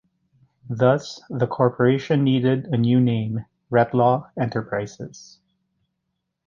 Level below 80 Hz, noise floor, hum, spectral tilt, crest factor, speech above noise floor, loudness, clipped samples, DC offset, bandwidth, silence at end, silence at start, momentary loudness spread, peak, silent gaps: -60 dBFS; -78 dBFS; none; -8 dB/octave; 18 dB; 57 dB; -21 LUFS; under 0.1%; under 0.1%; 7.4 kHz; 1.25 s; 0.7 s; 13 LU; -4 dBFS; none